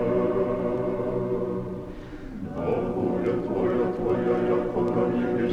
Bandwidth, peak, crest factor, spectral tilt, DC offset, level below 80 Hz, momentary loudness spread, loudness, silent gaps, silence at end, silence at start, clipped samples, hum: 6.8 kHz; -12 dBFS; 14 dB; -9 dB/octave; under 0.1%; -46 dBFS; 11 LU; -26 LUFS; none; 0 s; 0 s; under 0.1%; none